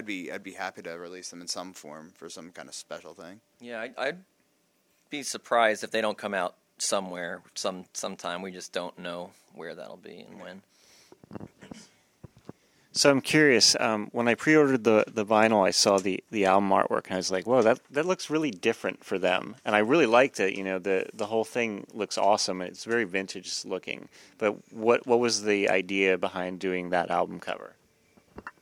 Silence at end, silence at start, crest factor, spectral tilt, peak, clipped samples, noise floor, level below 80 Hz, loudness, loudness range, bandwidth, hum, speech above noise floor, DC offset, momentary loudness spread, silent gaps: 0.1 s; 0 s; 24 dB; -3 dB/octave; -4 dBFS; under 0.1%; -69 dBFS; -74 dBFS; -26 LUFS; 16 LU; 16.5 kHz; none; 42 dB; under 0.1%; 21 LU; none